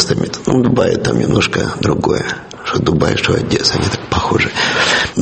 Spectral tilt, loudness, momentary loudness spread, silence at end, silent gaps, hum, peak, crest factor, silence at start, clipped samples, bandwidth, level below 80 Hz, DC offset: -4.5 dB/octave; -14 LUFS; 5 LU; 0 s; none; none; 0 dBFS; 14 dB; 0 s; under 0.1%; 8.8 kHz; -36 dBFS; under 0.1%